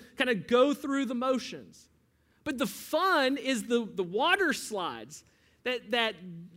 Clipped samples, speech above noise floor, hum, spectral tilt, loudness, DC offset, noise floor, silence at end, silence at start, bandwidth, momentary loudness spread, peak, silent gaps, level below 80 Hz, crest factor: under 0.1%; 38 dB; none; -3.5 dB/octave; -29 LUFS; under 0.1%; -68 dBFS; 0.1 s; 0 s; 16 kHz; 16 LU; -10 dBFS; none; -70 dBFS; 20 dB